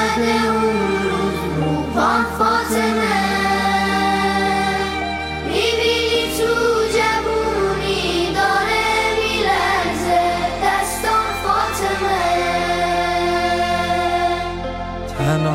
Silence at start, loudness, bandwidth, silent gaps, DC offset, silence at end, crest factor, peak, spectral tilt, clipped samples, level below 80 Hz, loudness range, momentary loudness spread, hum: 0 s; -18 LUFS; 16 kHz; none; under 0.1%; 0 s; 12 dB; -6 dBFS; -4 dB/octave; under 0.1%; -36 dBFS; 1 LU; 4 LU; none